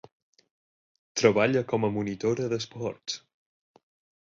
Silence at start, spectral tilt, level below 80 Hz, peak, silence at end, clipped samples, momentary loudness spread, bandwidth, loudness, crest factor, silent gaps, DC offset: 1.15 s; -5 dB/octave; -64 dBFS; -6 dBFS; 1.05 s; under 0.1%; 13 LU; 7.8 kHz; -27 LUFS; 24 dB; none; under 0.1%